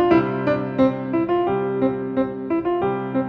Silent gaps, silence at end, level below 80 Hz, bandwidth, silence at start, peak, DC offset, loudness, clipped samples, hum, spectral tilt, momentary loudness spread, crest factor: none; 0 s; -52 dBFS; 5.4 kHz; 0 s; -4 dBFS; under 0.1%; -21 LUFS; under 0.1%; none; -9.5 dB/octave; 5 LU; 16 dB